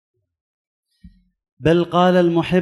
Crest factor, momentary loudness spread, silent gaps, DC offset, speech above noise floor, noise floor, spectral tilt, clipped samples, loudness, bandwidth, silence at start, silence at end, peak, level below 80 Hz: 16 dB; 4 LU; none; under 0.1%; 34 dB; -49 dBFS; -7.5 dB/octave; under 0.1%; -16 LUFS; 11.5 kHz; 1.6 s; 0 s; -4 dBFS; -48 dBFS